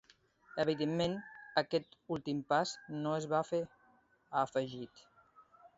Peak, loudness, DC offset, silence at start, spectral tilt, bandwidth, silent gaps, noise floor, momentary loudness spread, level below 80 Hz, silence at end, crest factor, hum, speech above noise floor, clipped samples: -16 dBFS; -36 LUFS; under 0.1%; 0.55 s; -4 dB/octave; 7.6 kHz; none; -69 dBFS; 10 LU; -72 dBFS; 0.1 s; 22 dB; none; 34 dB; under 0.1%